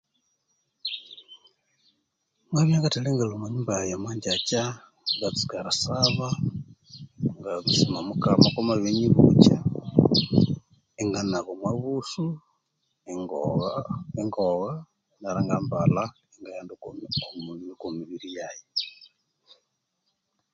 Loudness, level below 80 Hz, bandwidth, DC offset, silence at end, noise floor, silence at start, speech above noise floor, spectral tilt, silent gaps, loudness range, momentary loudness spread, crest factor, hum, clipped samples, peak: -25 LUFS; -54 dBFS; 9.2 kHz; under 0.1%; 1.65 s; -77 dBFS; 0.85 s; 53 dB; -5.5 dB/octave; none; 10 LU; 18 LU; 26 dB; none; under 0.1%; 0 dBFS